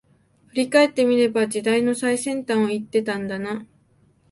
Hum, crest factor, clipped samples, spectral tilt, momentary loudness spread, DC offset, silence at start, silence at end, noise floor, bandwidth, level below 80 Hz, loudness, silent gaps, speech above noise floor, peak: none; 18 dB; under 0.1%; -4.5 dB/octave; 11 LU; under 0.1%; 0.55 s; 0.7 s; -59 dBFS; 11.5 kHz; -66 dBFS; -21 LUFS; none; 39 dB; -4 dBFS